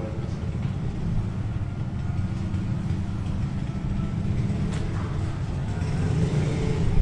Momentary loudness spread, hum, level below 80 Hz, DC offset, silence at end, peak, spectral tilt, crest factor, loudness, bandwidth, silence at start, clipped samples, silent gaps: 5 LU; none; -34 dBFS; under 0.1%; 0 s; -10 dBFS; -8 dB/octave; 16 dB; -28 LUFS; 10.5 kHz; 0 s; under 0.1%; none